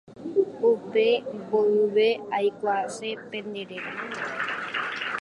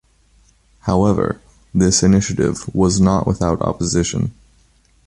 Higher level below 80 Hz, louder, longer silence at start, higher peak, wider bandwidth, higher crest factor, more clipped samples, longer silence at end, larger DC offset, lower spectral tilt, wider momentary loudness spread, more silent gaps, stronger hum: second, -72 dBFS vs -34 dBFS; second, -26 LUFS vs -17 LUFS; second, 0.1 s vs 0.85 s; second, -10 dBFS vs -2 dBFS; about the same, 11 kHz vs 11.5 kHz; about the same, 16 dB vs 16 dB; neither; second, 0 s vs 0.75 s; neither; about the same, -4.5 dB/octave vs -5.5 dB/octave; about the same, 12 LU vs 10 LU; neither; neither